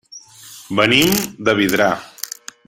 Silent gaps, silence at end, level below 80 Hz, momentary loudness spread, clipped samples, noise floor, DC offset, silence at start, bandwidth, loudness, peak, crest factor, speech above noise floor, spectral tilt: none; 0.4 s; -50 dBFS; 16 LU; under 0.1%; -41 dBFS; under 0.1%; 0.1 s; 17 kHz; -16 LUFS; 0 dBFS; 18 dB; 25 dB; -3.5 dB/octave